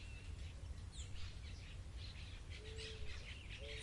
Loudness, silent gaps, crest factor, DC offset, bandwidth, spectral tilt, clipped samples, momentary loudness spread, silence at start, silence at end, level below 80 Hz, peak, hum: -52 LUFS; none; 14 dB; under 0.1%; 11.5 kHz; -4 dB/octave; under 0.1%; 3 LU; 0 s; 0 s; -54 dBFS; -34 dBFS; none